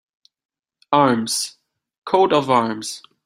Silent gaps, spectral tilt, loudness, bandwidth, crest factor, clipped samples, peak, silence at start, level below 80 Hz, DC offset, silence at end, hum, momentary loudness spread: 1.98-2.02 s; -4 dB/octave; -19 LUFS; 16 kHz; 20 dB; under 0.1%; -2 dBFS; 0.9 s; -62 dBFS; under 0.1%; 0.25 s; none; 13 LU